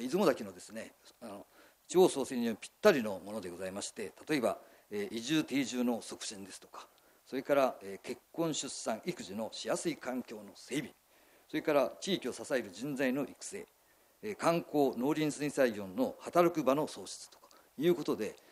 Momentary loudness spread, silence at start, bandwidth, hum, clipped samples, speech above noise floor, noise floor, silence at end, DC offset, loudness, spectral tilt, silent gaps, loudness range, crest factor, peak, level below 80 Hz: 18 LU; 0 s; 15.5 kHz; none; under 0.1%; 30 dB; -64 dBFS; 0.15 s; under 0.1%; -34 LUFS; -4.5 dB/octave; none; 4 LU; 24 dB; -12 dBFS; -76 dBFS